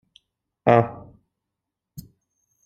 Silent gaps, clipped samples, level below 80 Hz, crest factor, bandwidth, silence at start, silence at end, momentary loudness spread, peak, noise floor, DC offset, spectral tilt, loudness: none; under 0.1%; -60 dBFS; 24 dB; 15.5 kHz; 0.65 s; 1.7 s; 26 LU; -2 dBFS; -84 dBFS; under 0.1%; -8.5 dB/octave; -21 LUFS